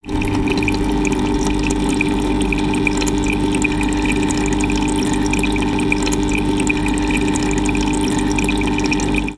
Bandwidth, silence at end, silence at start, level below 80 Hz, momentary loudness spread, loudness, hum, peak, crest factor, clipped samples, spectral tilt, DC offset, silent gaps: 11 kHz; 0 s; 0.05 s; -26 dBFS; 1 LU; -17 LUFS; 50 Hz at -25 dBFS; 0 dBFS; 16 dB; under 0.1%; -5 dB/octave; under 0.1%; none